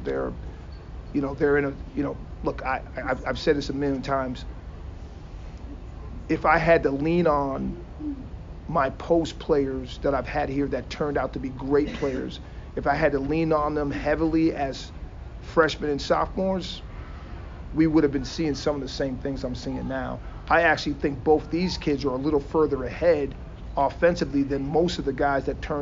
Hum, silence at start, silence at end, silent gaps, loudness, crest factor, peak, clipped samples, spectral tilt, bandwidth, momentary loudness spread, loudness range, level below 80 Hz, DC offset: none; 0 s; 0 s; none; -25 LUFS; 20 dB; -6 dBFS; under 0.1%; -6.5 dB/octave; 7.6 kHz; 18 LU; 4 LU; -38 dBFS; under 0.1%